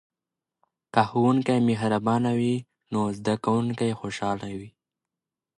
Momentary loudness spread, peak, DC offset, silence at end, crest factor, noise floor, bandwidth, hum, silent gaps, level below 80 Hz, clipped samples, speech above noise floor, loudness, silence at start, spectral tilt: 10 LU; -6 dBFS; under 0.1%; 0.9 s; 20 dB; -89 dBFS; 11 kHz; none; none; -62 dBFS; under 0.1%; 65 dB; -25 LUFS; 0.95 s; -7 dB/octave